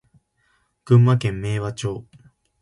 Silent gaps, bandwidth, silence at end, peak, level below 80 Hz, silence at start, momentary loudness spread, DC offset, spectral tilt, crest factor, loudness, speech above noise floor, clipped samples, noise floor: none; 11.5 kHz; 0.6 s; -4 dBFS; -50 dBFS; 0.85 s; 14 LU; under 0.1%; -7.5 dB/octave; 18 dB; -20 LUFS; 47 dB; under 0.1%; -66 dBFS